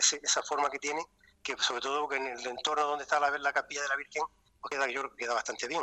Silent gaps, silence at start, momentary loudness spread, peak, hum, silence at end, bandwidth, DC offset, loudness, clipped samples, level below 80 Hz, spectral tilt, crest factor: none; 0 s; 9 LU; -12 dBFS; none; 0 s; 11 kHz; under 0.1%; -32 LUFS; under 0.1%; -72 dBFS; 0.5 dB/octave; 22 dB